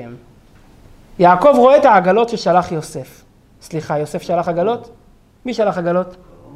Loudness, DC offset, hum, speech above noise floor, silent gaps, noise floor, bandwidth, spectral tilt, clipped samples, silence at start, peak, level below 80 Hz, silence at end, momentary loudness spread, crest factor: -14 LUFS; under 0.1%; none; 31 dB; none; -46 dBFS; 13.5 kHz; -6.5 dB/octave; under 0.1%; 0 s; 0 dBFS; -48 dBFS; 0.4 s; 19 LU; 16 dB